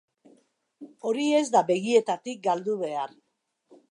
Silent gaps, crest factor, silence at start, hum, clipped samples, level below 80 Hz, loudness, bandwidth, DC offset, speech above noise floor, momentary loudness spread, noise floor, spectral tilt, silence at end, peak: none; 20 dB; 0.8 s; none; under 0.1%; -84 dBFS; -26 LUFS; 11 kHz; under 0.1%; 53 dB; 11 LU; -78 dBFS; -4.5 dB/octave; 0.85 s; -8 dBFS